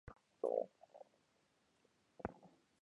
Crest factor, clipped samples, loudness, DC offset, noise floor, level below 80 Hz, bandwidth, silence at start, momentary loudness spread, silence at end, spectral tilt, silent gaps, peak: 26 dB; under 0.1%; -45 LUFS; under 0.1%; -79 dBFS; -72 dBFS; 10 kHz; 0.05 s; 24 LU; 0.35 s; -8 dB/octave; none; -24 dBFS